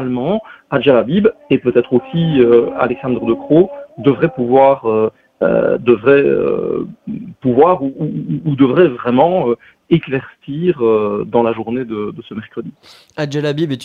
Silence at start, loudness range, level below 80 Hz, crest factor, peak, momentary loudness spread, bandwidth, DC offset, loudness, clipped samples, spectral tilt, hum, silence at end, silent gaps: 0 s; 4 LU; -50 dBFS; 14 dB; 0 dBFS; 13 LU; 7 kHz; under 0.1%; -15 LUFS; under 0.1%; -8.5 dB/octave; none; 0 s; none